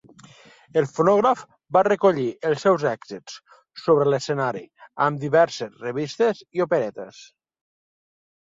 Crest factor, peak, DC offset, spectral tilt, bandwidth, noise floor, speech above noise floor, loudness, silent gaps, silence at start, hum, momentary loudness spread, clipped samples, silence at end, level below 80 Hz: 18 dB; -6 dBFS; under 0.1%; -6 dB/octave; 7.8 kHz; -50 dBFS; 28 dB; -22 LUFS; none; 0.75 s; none; 17 LU; under 0.1%; 1.2 s; -68 dBFS